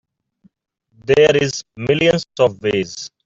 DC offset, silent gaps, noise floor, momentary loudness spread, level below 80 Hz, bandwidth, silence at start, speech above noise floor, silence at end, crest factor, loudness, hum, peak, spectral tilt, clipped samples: under 0.1%; none; -64 dBFS; 11 LU; -50 dBFS; 7.8 kHz; 1.05 s; 48 dB; 0.2 s; 16 dB; -17 LUFS; none; -2 dBFS; -4.5 dB/octave; under 0.1%